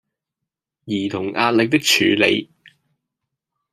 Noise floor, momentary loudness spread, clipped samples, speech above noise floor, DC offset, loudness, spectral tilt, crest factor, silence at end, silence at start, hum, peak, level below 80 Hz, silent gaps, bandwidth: -84 dBFS; 9 LU; under 0.1%; 66 dB; under 0.1%; -17 LUFS; -3.5 dB/octave; 20 dB; 1.3 s; 0.85 s; none; -2 dBFS; -66 dBFS; none; 15.5 kHz